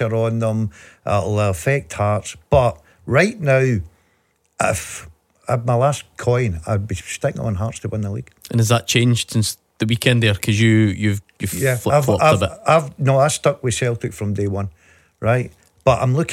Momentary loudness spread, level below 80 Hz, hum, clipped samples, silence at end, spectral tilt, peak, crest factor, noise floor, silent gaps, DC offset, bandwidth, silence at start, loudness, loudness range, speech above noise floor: 10 LU; -44 dBFS; none; under 0.1%; 0 s; -5.5 dB/octave; -2 dBFS; 18 dB; -63 dBFS; none; under 0.1%; 16 kHz; 0 s; -19 LUFS; 5 LU; 45 dB